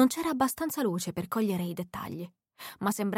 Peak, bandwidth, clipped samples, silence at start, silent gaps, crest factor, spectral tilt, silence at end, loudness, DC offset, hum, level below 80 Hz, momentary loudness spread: -12 dBFS; 17 kHz; under 0.1%; 0 s; none; 18 dB; -5 dB/octave; 0 s; -31 LUFS; under 0.1%; none; -64 dBFS; 14 LU